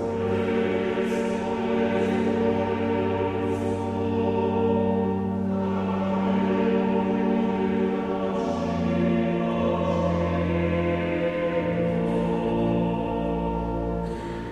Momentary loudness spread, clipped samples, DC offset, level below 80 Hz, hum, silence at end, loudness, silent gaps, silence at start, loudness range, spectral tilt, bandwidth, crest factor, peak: 4 LU; under 0.1%; under 0.1%; -44 dBFS; none; 0 s; -25 LUFS; none; 0 s; 1 LU; -8 dB/octave; 10 kHz; 12 dB; -12 dBFS